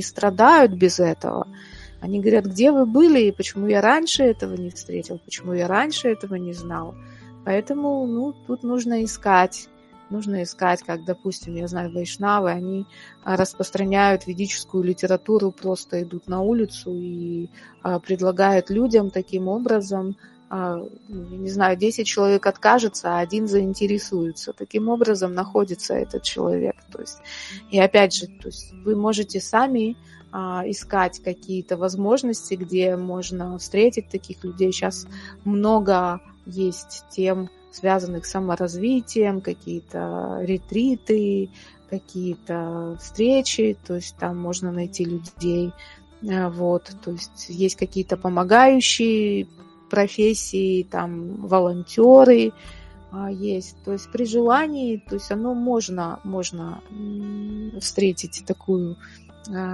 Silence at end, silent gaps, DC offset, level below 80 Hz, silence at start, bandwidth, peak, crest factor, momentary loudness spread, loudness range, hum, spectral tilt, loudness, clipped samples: 0 s; none; under 0.1%; -52 dBFS; 0 s; 11.5 kHz; 0 dBFS; 22 dB; 15 LU; 7 LU; none; -5 dB/octave; -21 LUFS; under 0.1%